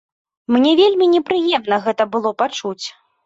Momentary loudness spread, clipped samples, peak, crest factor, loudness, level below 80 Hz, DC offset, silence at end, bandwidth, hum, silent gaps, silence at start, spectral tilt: 14 LU; under 0.1%; -2 dBFS; 14 dB; -16 LUFS; -64 dBFS; under 0.1%; 0.35 s; 7.8 kHz; none; none; 0.5 s; -4 dB/octave